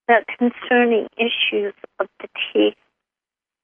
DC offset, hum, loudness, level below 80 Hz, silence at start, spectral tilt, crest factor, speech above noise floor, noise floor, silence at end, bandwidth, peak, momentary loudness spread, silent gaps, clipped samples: under 0.1%; none; -20 LUFS; -72 dBFS; 0.1 s; -7 dB/octave; 20 dB; 69 dB; -89 dBFS; 0.95 s; 3.8 kHz; -2 dBFS; 12 LU; none; under 0.1%